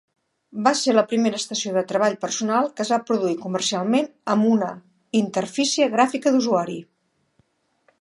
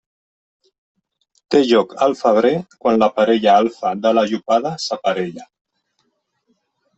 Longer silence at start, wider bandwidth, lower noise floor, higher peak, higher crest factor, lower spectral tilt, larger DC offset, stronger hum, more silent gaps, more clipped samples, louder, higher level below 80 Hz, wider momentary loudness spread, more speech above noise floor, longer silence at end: second, 0.55 s vs 1.5 s; first, 11.5 kHz vs 8.2 kHz; about the same, -66 dBFS vs -69 dBFS; about the same, -2 dBFS vs -2 dBFS; about the same, 20 dB vs 16 dB; second, -4 dB/octave vs -5.5 dB/octave; neither; neither; neither; neither; second, -22 LUFS vs -17 LUFS; second, -74 dBFS vs -62 dBFS; about the same, 6 LU vs 7 LU; second, 45 dB vs 52 dB; second, 1.15 s vs 1.55 s